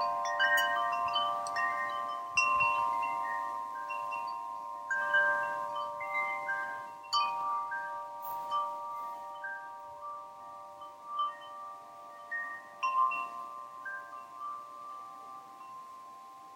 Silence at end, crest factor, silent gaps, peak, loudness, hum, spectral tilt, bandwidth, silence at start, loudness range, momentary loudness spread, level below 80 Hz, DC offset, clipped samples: 0 s; 20 dB; none; -16 dBFS; -33 LUFS; none; -0.5 dB/octave; 16.5 kHz; 0 s; 10 LU; 20 LU; -80 dBFS; under 0.1%; under 0.1%